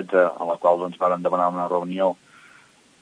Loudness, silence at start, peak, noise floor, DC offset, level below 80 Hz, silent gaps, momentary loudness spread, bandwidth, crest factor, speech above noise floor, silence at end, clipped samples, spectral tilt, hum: -22 LUFS; 0 s; -4 dBFS; -53 dBFS; under 0.1%; -78 dBFS; none; 5 LU; 10 kHz; 18 dB; 32 dB; 0.85 s; under 0.1%; -7 dB/octave; none